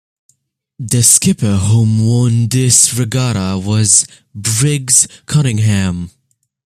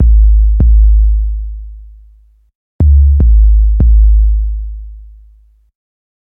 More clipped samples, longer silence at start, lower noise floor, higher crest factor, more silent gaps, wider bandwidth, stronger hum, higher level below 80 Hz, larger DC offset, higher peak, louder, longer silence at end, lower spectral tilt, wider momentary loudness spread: neither; first, 0.8 s vs 0 s; first, -59 dBFS vs -45 dBFS; first, 14 dB vs 8 dB; second, none vs 2.55-2.79 s; first, over 20 kHz vs 0.9 kHz; neither; second, -46 dBFS vs -10 dBFS; neither; about the same, 0 dBFS vs -2 dBFS; about the same, -12 LUFS vs -10 LUFS; second, 0.55 s vs 1.35 s; second, -4 dB/octave vs -13.5 dB/octave; second, 11 LU vs 18 LU